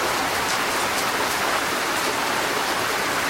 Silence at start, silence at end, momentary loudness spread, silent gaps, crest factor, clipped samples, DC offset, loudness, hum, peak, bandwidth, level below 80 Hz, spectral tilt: 0 s; 0 s; 1 LU; none; 16 dB; under 0.1%; under 0.1%; -22 LUFS; none; -6 dBFS; 16 kHz; -52 dBFS; -1.5 dB/octave